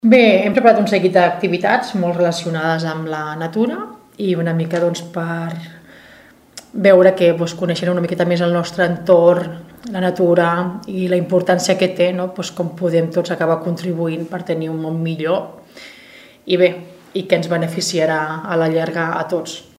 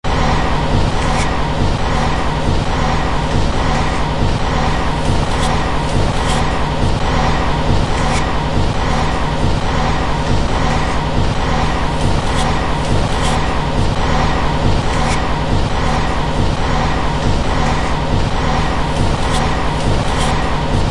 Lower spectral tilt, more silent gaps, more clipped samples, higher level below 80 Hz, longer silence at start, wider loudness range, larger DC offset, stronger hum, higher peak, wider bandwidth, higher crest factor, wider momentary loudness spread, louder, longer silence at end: about the same, -6 dB/octave vs -5.5 dB/octave; neither; neither; second, -60 dBFS vs -20 dBFS; about the same, 0.05 s vs 0.05 s; first, 6 LU vs 0 LU; neither; neither; about the same, 0 dBFS vs 0 dBFS; first, 15 kHz vs 11.5 kHz; about the same, 16 dB vs 14 dB; first, 13 LU vs 1 LU; about the same, -17 LUFS vs -17 LUFS; first, 0.15 s vs 0 s